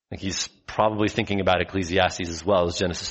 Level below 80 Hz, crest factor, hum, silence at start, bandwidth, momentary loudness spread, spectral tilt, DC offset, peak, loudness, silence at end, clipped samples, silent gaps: -48 dBFS; 20 dB; none; 0.1 s; 8.2 kHz; 7 LU; -4 dB/octave; under 0.1%; -4 dBFS; -24 LUFS; 0 s; under 0.1%; none